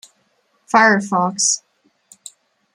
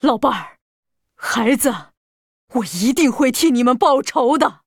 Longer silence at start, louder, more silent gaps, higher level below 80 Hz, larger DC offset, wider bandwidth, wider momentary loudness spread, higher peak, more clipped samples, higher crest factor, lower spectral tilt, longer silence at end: first, 0.75 s vs 0.05 s; about the same, -16 LUFS vs -17 LUFS; second, none vs 0.61-0.83 s, 1.97-2.48 s; second, -70 dBFS vs -54 dBFS; neither; second, 14.5 kHz vs over 20 kHz; second, 7 LU vs 10 LU; about the same, -2 dBFS vs -2 dBFS; neither; about the same, 18 dB vs 16 dB; about the same, -2.5 dB/octave vs -3.5 dB/octave; first, 1.2 s vs 0.15 s